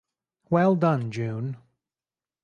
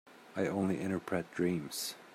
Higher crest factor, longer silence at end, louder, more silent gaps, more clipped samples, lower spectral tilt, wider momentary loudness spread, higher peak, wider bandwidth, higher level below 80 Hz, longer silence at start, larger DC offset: about the same, 18 dB vs 18 dB; first, 0.9 s vs 0 s; first, -25 LUFS vs -36 LUFS; neither; neither; first, -9 dB/octave vs -5 dB/octave; first, 14 LU vs 5 LU; first, -8 dBFS vs -18 dBFS; second, 8.8 kHz vs 15.5 kHz; first, -68 dBFS vs -74 dBFS; first, 0.5 s vs 0.05 s; neither